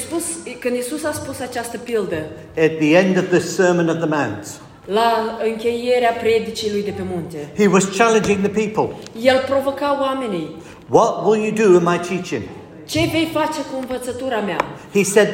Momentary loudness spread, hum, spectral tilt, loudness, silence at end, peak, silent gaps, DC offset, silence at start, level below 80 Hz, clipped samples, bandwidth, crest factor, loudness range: 12 LU; none; -5 dB/octave; -19 LUFS; 0 s; 0 dBFS; none; under 0.1%; 0 s; -52 dBFS; under 0.1%; 16.5 kHz; 18 dB; 2 LU